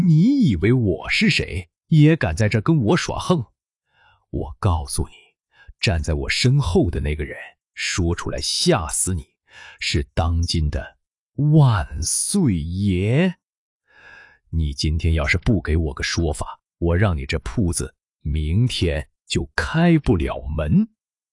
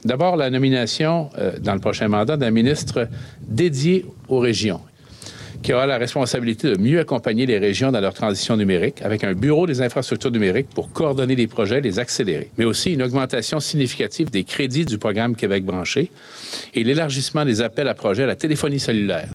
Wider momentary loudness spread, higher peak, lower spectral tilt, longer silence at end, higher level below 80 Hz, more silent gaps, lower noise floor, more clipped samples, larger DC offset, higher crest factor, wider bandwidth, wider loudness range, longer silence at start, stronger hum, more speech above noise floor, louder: first, 12 LU vs 6 LU; first, -2 dBFS vs -6 dBFS; about the same, -5.5 dB/octave vs -5.5 dB/octave; first, 0.45 s vs 0 s; first, -34 dBFS vs -52 dBFS; first, 3.76-3.80 s, 11.18-11.32 s, 13.43-13.48 s, 13.57-13.80 s vs none; first, -66 dBFS vs -40 dBFS; neither; neither; about the same, 18 dB vs 14 dB; second, 11.5 kHz vs 14 kHz; about the same, 4 LU vs 2 LU; about the same, 0 s vs 0.05 s; neither; first, 46 dB vs 20 dB; about the same, -20 LUFS vs -20 LUFS